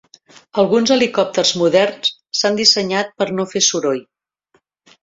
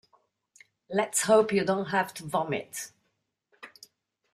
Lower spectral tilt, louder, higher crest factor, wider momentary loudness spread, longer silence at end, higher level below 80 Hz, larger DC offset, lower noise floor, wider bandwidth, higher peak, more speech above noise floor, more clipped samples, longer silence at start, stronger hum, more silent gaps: second, -2.5 dB/octave vs -4 dB/octave; first, -16 LUFS vs -27 LUFS; about the same, 18 dB vs 22 dB; second, 8 LU vs 19 LU; first, 1 s vs 0.65 s; first, -62 dBFS vs -72 dBFS; neither; second, -62 dBFS vs -78 dBFS; second, 7.8 kHz vs 15.5 kHz; first, 0 dBFS vs -8 dBFS; second, 46 dB vs 51 dB; neither; second, 0.55 s vs 0.9 s; neither; neither